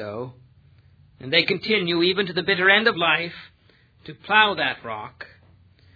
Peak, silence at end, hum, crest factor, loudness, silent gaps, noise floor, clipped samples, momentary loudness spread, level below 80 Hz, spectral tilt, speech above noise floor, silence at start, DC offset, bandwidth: -2 dBFS; 0.7 s; none; 22 dB; -20 LUFS; none; -57 dBFS; under 0.1%; 22 LU; -64 dBFS; -6.5 dB/octave; 35 dB; 0 s; under 0.1%; 5 kHz